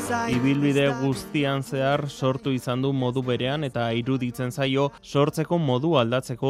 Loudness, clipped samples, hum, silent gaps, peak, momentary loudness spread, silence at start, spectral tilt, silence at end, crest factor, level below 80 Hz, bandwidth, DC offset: -24 LUFS; under 0.1%; none; none; -6 dBFS; 5 LU; 0 s; -6.5 dB/octave; 0 s; 18 dB; -56 dBFS; 15 kHz; under 0.1%